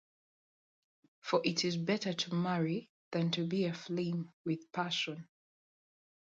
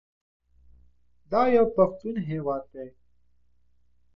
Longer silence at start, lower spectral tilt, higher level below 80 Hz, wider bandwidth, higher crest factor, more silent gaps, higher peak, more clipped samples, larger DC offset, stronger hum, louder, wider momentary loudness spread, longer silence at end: first, 1.25 s vs 0.65 s; second, -5 dB/octave vs -9.5 dB/octave; second, -80 dBFS vs -58 dBFS; first, 7.8 kHz vs 6 kHz; about the same, 20 dB vs 20 dB; first, 2.89-3.11 s, 4.33-4.44 s vs none; second, -16 dBFS vs -8 dBFS; neither; neither; neither; second, -35 LUFS vs -25 LUFS; second, 7 LU vs 22 LU; second, 0.95 s vs 1.25 s